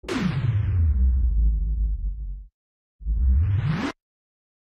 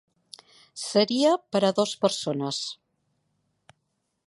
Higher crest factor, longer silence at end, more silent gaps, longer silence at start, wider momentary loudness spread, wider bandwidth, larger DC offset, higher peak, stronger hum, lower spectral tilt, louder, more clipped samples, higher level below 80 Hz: second, 12 dB vs 22 dB; second, 0.8 s vs 1.5 s; first, 2.54-2.99 s vs none; second, 0.05 s vs 0.75 s; about the same, 13 LU vs 14 LU; second, 7.8 kHz vs 11.5 kHz; neither; second, -12 dBFS vs -6 dBFS; neither; first, -7.5 dB/octave vs -4.5 dB/octave; about the same, -25 LUFS vs -25 LUFS; neither; first, -24 dBFS vs -74 dBFS